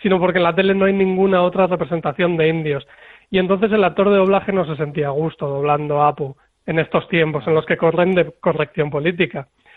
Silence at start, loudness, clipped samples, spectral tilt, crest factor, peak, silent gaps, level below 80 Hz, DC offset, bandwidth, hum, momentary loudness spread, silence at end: 0 s; -18 LUFS; under 0.1%; -9.5 dB/octave; 16 dB; -2 dBFS; none; -52 dBFS; under 0.1%; 4.4 kHz; none; 7 LU; 0.35 s